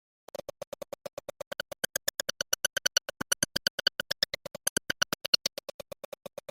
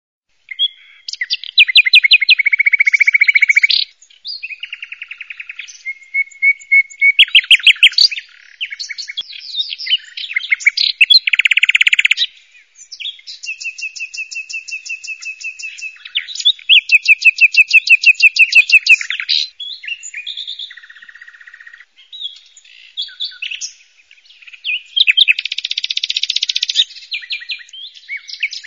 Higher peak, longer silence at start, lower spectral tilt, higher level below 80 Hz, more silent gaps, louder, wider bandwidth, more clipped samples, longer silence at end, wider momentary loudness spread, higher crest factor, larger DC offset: second, -6 dBFS vs 0 dBFS; first, 2.3 s vs 0.6 s; first, 0 dB/octave vs 6.5 dB/octave; first, -66 dBFS vs -72 dBFS; first, 3.70-3.78 s, 4.69-4.76 s, 5.28-5.33 s vs none; second, -30 LUFS vs -10 LUFS; about the same, 17 kHz vs 16 kHz; neither; first, 1.15 s vs 0.05 s; about the same, 18 LU vs 20 LU; first, 28 dB vs 16 dB; neither